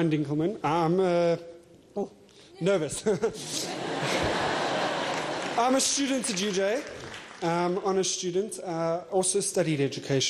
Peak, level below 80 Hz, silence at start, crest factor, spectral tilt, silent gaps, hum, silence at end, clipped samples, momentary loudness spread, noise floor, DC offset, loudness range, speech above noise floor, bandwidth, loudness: -12 dBFS; -60 dBFS; 0 s; 14 dB; -4 dB/octave; none; none; 0 s; under 0.1%; 9 LU; -52 dBFS; under 0.1%; 2 LU; 26 dB; 14.5 kHz; -27 LUFS